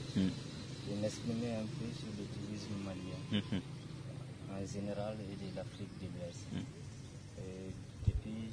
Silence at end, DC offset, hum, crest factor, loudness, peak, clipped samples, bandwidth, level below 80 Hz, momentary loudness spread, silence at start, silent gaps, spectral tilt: 0 s; under 0.1%; none; 22 dB; -43 LUFS; -18 dBFS; under 0.1%; 10.5 kHz; -54 dBFS; 10 LU; 0 s; none; -6 dB/octave